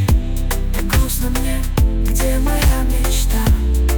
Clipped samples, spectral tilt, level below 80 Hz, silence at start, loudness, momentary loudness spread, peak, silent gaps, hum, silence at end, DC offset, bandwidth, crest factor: under 0.1%; -5 dB/octave; -16 dBFS; 0 s; -18 LUFS; 5 LU; -4 dBFS; none; none; 0 s; under 0.1%; 19.5 kHz; 10 dB